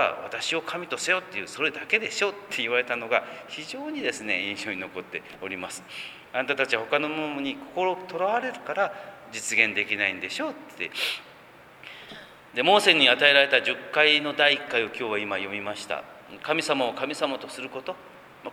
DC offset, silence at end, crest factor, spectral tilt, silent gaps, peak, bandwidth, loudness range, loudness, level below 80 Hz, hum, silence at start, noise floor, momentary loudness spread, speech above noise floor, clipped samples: under 0.1%; 0 s; 24 dB; -2 dB/octave; none; -2 dBFS; 20 kHz; 9 LU; -25 LUFS; -72 dBFS; none; 0 s; -50 dBFS; 17 LU; 24 dB; under 0.1%